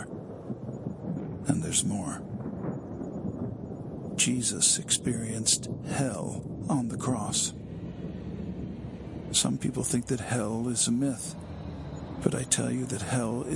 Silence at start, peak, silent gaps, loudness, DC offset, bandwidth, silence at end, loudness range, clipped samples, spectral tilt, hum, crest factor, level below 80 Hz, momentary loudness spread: 0 s; -8 dBFS; none; -30 LUFS; under 0.1%; 12 kHz; 0 s; 5 LU; under 0.1%; -3.5 dB/octave; none; 22 dB; -54 dBFS; 14 LU